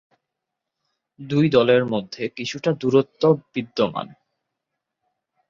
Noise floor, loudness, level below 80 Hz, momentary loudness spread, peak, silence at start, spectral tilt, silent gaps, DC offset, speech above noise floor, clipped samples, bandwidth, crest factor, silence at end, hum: -83 dBFS; -21 LUFS; -62 dBFS; 12 LU; -4 dBFS; 1.2 s; -6.5 dB/octave; none; under 0.1%; 62 dB; under 0.1%; 7.4 kHz; 20 dB; 1.4 s; none